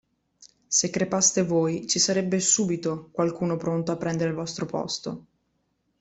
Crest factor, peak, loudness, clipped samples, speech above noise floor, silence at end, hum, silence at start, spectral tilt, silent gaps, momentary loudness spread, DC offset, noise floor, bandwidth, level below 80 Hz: 20 dB; -6 dBFS; -24 LUFS; under 0.1%; 48 dB; 0.8 s; none; 0.4 s; -3.5 dB/octave; none; 10 LU; under 0.1%; -73 dBFS; 8.4 kHz; -64 dBFS